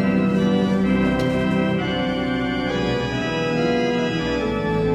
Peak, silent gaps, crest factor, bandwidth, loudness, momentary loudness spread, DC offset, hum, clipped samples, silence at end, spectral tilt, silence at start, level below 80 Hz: -8 dBFS; none; 12 dB; 9.6 kHz; -21 LUFS; 4 LU; under 0.1%; none; under 0.1%; 0 s; -7 dB/octave; 0 s; -40 dBFS